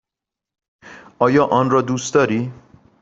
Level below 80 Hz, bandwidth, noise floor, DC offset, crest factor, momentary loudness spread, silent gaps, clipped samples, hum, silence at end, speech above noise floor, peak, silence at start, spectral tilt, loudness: -58 dBFS; 8 kHz; -86 dBFS; under 0.1%; 18 dB; 7 LU; none; under 0.1%; none; 0.5 s; 70 dB; -2 dBFS; 0.85 s; -6 dB/octave; -17 LUFS